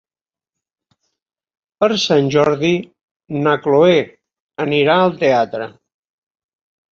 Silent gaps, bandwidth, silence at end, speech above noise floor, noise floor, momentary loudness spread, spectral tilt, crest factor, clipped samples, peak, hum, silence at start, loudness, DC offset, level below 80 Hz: 3.03-3.20 s, 4.40-4.49 s; 7.6 kHz; 1.25 s; over 75 dB; under -90 dBFS; 14 LU; -5.5 dB/octave; 16 dB; under 0.1%; -2 dBFS; none; 1.8 s; -15 LUFS; under 0.1%; -58 dBFS